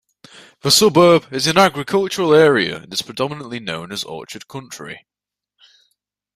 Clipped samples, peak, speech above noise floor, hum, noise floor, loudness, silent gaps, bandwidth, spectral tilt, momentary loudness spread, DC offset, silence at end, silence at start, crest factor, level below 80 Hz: under 0.1%; 0 dBFS; 66 dB; 50 Hz at -50 dBFS; -82 dBFS; -16 LUFS; none; 15.5 kHz; -3.5 dB/octave; 20 LU; under 0.1%; 1.4 s; 0.65 s; 18 dB; -58 dBFS